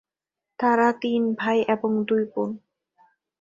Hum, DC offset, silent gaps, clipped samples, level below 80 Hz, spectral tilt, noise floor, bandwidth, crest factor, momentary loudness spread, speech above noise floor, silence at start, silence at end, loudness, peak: none; under 0.1%; none; under 0.1%; -72 dBFS; -6.5 dB/octave; -87 dBFS; 7.6 kHz; 18 dB; 9 LU; 65 dB; 0.6 s; 0.85 s; -23 LUFS; -6 dBFS